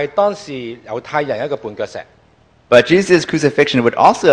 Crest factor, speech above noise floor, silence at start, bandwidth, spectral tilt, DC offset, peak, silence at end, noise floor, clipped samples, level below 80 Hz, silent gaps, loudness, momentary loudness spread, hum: 14 dB; 37 dB; 0 s; 11 kHz; -5 dB/octave; under 0.1%; 0 dBFS; 0 s; -51 dBFS; 0.4%; -52 dBFS; none; -14 LUFS; 16 LU; none